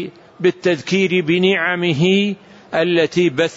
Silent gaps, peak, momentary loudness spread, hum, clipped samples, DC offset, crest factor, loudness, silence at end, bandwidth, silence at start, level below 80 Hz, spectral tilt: none; -4 dBFS; 7 LU; none; under 0.1%; under 0.1%; 12 dB; -17 LUFS; 0 s; 8 kHz; 0 s; -60 dBFS; -6 dB/octave